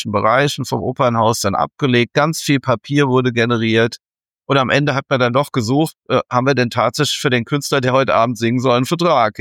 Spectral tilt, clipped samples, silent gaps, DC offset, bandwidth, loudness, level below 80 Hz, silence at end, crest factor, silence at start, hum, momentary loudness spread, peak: -5 dB/octave; under 0.1%; none; under 0.1%; 17.5 kHz; -16 LUFS; -56 dBFS; 0 s; 14 dB; 0 s; none; 4 LU; -2 dBFS